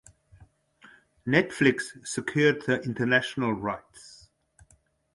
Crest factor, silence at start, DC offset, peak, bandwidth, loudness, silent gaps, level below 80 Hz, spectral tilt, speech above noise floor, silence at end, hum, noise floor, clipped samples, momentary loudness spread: 22 dB; 0.4 s; under 0.1%; -6 dBFS; 11.5 kHz; -26 LUFS; none; -62 dBFS; -5 dB/octave; 38 dB; 1 s; none; -64 dBFS; under 0.1%; 15 LU